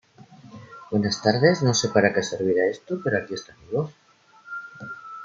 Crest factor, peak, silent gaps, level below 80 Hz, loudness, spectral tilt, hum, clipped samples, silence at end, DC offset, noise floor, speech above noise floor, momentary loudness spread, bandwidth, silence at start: 22 dB; -2 dBFS; none; -64 dBFS; -23 LUFS; -4.5 dB/octave; none; under 0.1%; 0 s; under 0.1%; -52 dBFS; 30 dB; 18 LU; 7.8 kHz; 0.3 s